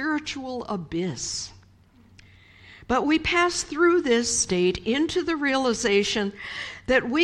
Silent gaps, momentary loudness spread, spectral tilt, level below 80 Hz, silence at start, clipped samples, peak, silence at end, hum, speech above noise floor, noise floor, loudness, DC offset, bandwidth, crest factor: none; 11 LU; -3 dB/octave; -50 dBFS; 0 s; under 0.1%; -8 dBFS; 0 s; none; 31 dB; -55 dBFS; -24 LUFS; under 0.1%; 11.5 kHz; 18 dB